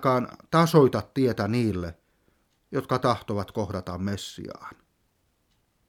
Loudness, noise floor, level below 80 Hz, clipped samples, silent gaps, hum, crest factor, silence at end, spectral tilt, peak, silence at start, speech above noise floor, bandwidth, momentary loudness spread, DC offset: -25 LUFS; -70 dBFS; -56 dBFS; under 0.1%; none; none; 22 dB; 1.15 s; -6.5 dB/octave; -4 dBFS; 0 s; 45 dB; 17.5 kHz; 18 LU; under 0.1%